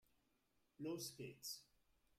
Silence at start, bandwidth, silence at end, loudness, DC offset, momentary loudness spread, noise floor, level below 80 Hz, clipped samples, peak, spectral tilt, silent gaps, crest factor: 0.8 s; 15.5 kHz; 0.55 s; -51 LUFS; under 0.1%; 5 LU; -83 dBFS; -86 dBFS; under 0.1%; -38 dBFS; -3.5 dB/octave; none; 18 dB